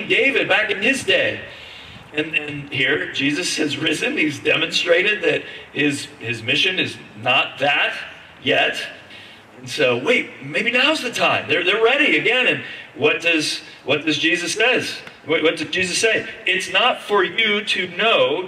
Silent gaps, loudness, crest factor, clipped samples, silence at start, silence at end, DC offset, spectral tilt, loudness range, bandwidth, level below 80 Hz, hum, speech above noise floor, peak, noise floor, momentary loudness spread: none; -18 LUFS; 16 dB; under 0.1%; 0 s; 0 s; under 0.1%; -3 dB/octave; 3 LU; 14.5 kHz; -62 dBFS; none; 22 dB; -4 dBFS; -41 dBFS; 11 LU